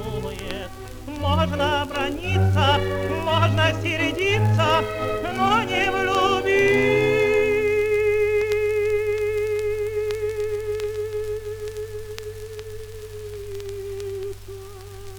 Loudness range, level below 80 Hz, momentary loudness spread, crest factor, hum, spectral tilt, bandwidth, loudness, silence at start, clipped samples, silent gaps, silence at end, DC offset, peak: 12 LU; -42 dBFS; 16 LU; 16 dB; none; -5.5 dB/octave; 20 kHz; -22 LUFS; 0 s; under 0.1%; none; 0 s; under 0.1%; -6 dBFS